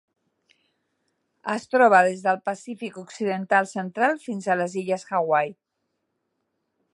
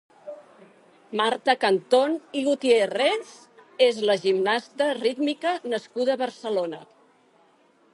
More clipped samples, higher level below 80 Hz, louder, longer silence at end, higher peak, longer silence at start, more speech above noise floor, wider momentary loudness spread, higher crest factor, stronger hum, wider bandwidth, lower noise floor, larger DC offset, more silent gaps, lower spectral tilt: neither; about the same, -78 dBFS vs -82 dBFS; about the same, -23 LUFS vs -24 LUFS; first, 1.4 s vs 1.1 s; about the same, -4 dBFS vs -4 dBFS; first, 1.45 s vs 0.25 s; first, 54 dB vs 37 dB; second, 16 LU vs 19 LU; about the same, 22 dB vs 20 dB; neither; about the same, 11.5 kHz vs 11.5 kHz; first, -77 dBFS vs -60 dBFS; neither; neither; first, -5.5 dB/octave vs -4 dB/octave